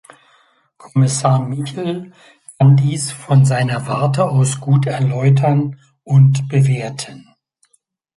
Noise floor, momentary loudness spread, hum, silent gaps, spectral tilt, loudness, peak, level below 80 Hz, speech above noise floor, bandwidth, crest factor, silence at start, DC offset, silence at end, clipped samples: -62 dBFS; 12 LU; none; none; -6.5 dB/octave; -16 LUFS; -2 dBFS; -56 dBFS; 48 dB; 11.5 kHz; 14 dB; 0.85 s; under 0.1%; 0.95 s; under 0.1%